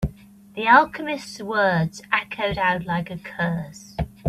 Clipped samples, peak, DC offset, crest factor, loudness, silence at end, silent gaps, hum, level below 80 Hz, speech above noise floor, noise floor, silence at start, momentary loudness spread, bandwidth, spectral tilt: under 0.1%; -2 dBFS; under 0.1%; 22 dB; -22 LUFS; 0 s; none; none; -42 dBFS; 23 dB; -46 dBFS; 0 s; 16 LU; 14 kHz; -5.5 dB/octave